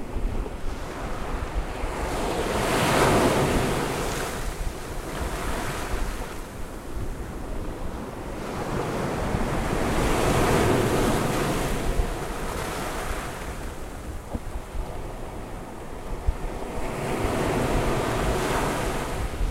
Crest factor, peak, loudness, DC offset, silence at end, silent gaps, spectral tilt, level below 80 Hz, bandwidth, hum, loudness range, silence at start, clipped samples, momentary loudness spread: 18 dB; -8 dBFS; -27 LUFS; under 0.1%; 0 s; none; -5 dB/octave; -32 dBFS; 16 kHz; none; 9 LU; 0 s; under 0.1%; 14 LU